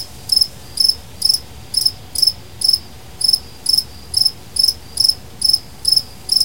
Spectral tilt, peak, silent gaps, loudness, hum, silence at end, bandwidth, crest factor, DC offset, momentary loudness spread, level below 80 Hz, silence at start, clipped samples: 0 dB/octave; 0 dBFS; none; -15 LUFS; none; 0 s; 17 kHz; 18 dB; 1%; 3 LU; -44 dBFS; 0 s; under 0.1%